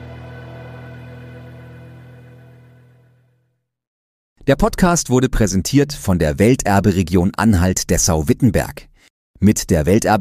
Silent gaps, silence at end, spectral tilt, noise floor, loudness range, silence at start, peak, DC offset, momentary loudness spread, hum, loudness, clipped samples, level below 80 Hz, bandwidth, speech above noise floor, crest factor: 3.87-4.36 s, 9.10-9.34 s; 0 s; -5.5 dB/octave; -67 dBFS; 10 LU; 0 s; -2 dBFS; under 0.1%; 21 LU; none; -16 LUFS; under 0.1%; -32 dBFS; 15.5 kHz; 53 dB; 16 dB